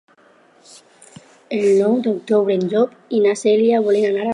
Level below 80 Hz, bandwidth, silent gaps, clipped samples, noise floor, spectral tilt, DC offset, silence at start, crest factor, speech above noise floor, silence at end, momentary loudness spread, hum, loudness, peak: -74 dBFS; 11 kHz; none; under 0.1%; -52 dBFS; -6 dB/octave; under 0.1%; 1.5 s; 14 dB; 36 dB; 0 s; 5 LU; none; -17 LUFS; -4 dBFS